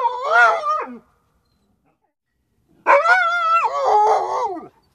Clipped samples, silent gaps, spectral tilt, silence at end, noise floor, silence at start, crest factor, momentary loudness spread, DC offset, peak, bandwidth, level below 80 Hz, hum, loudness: under 0.1%; none; -1.5 dB/octave; 0.25 s; -71 dBFS; 0 s; 18 dB; 12 LU; under 0.1%; -2 dBFS; 11.5 kHz; -66 dBFS; none; -17 LUFS